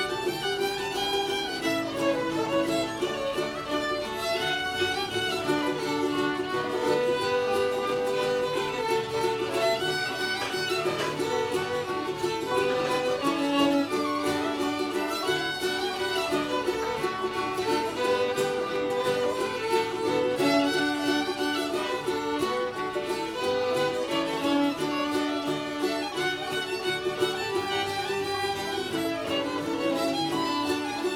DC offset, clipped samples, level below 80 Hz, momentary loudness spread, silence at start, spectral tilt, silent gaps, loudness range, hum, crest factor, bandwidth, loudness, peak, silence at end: under 0.1%; under 0.1%; -60 dBFS; 4 LU; 0 s; -3.5 dB/octave; none; 2 LU; none; 16 dB; 17.5 kHz; -27 LUFS; -12 dBFS; 0 s